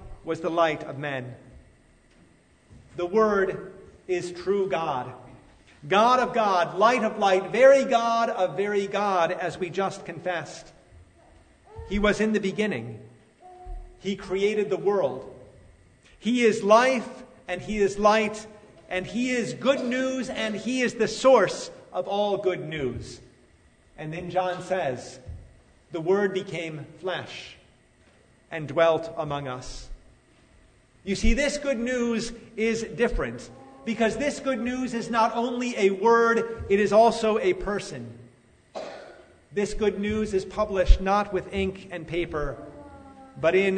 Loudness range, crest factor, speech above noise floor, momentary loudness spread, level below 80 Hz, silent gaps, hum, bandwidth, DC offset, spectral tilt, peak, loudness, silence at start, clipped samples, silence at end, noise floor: 8 LU; 22 dB; 34 dB; 20 LU; -38 dBFS; none; none; 9.6 kHz; under 0.1%; -5 dB/octave; -4 dBFS; -25 LUFS; 0 s; under 0.1%; 0 s; -59 dBFS